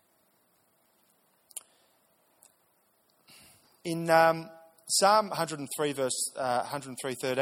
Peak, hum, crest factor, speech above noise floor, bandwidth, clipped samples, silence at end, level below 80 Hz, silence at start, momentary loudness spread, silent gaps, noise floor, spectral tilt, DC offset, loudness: -8 dBFS; none; 24 dB; 42 dB; 17 kHz; under 0.1%; 0 s; -78 dBFS; 1.55 s; 22 LU; none; -70 dBFS; -3 dB/octave; under 0.1%; -28 LUFS